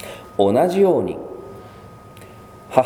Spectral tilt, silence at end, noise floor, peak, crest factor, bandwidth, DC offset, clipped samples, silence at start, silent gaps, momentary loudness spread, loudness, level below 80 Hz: -7 dB/octave; 0 s; -41 dBFS; 0 dBFS; 20 dB; 15.5 kHz; under 0.1%; under 0.1%; 0 s; none; 24 LU; -18 LUFS; -54 dBFS